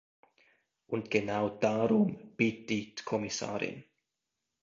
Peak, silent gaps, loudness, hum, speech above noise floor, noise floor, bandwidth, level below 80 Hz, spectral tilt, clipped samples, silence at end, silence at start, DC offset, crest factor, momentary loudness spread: -12 dBFS; none; -32 LUFS; none; 55 dB; -87 dBFS; 7.6 kHz; -70 dBFS; -5.5 dB/octave; under 0.1%; 0.8 s; 0.9 s; under 0.1%; 20 dB; 10 LU